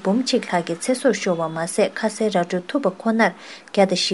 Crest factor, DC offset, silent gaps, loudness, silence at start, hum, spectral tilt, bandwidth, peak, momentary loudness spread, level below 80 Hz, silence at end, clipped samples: 20 dB; 0.1%; none; -21 LUFS; 0 s; none; -4.5 dB/octave; 11.5 kHz; -2 dBFS; 5 LU; -72 dBFS; 0 s; under 0.1%